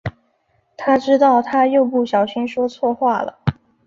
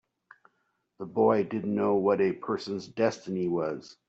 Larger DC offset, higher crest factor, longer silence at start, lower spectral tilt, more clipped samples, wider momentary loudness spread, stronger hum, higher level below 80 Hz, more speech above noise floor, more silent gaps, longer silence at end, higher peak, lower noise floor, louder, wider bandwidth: neither; about the same, 16 dB vs 20 dB; second, 0.05 s vs 1 s; about the same, -7.5 dB/octave vs -7 dB/octave; neither; about the same, 11 LU vs 10 LU; neither; first, -50 dBFS vs -72 dBFS; about the same, 47 dB vs 48 dB; neither; first, 0.35 s vs 0.15 s; first, -2 dBFS vs -10 dBFS; second, -63 dBFS vs -76 dBFS; first, -17 LUFS vs -28 LUFS; about the same, 7.4 kHz vs 8 kHz